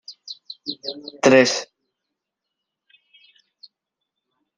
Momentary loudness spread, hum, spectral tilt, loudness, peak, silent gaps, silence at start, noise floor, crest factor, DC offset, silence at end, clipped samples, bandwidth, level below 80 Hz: 23 LU; none; -3.5 dB/octave; -19 LUFS; -2 dBFS; none; 0.1 s; -82 dBFS; 24 dB; under 0.1%; 2.95 s; under 0.1%; 10 kHz; -70 dBFS